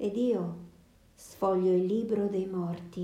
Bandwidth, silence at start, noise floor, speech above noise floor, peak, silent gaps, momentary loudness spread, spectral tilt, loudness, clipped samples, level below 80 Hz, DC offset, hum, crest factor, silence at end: 14.5 kHz; 0 s; -59 dBFS; 29 dB; -18 dBFS; none; 12 LU; -8 dB/octave; -30 LUFS; under 0.1%; -66 dBFS; under 0.1%; none; 12 dB; 0 s